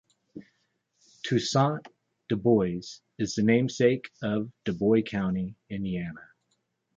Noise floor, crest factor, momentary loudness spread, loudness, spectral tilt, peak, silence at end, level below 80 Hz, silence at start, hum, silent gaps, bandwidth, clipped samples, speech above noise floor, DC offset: -76 dBFS; 20 dB; 14 LU; -27 LUFS; -6 dB/octave; -10 dBFS; 0.75 s; -58 dBFS; 0.35 s; none; none; 7.8 kHz; under 0.1%; 49 dB; under 0.1%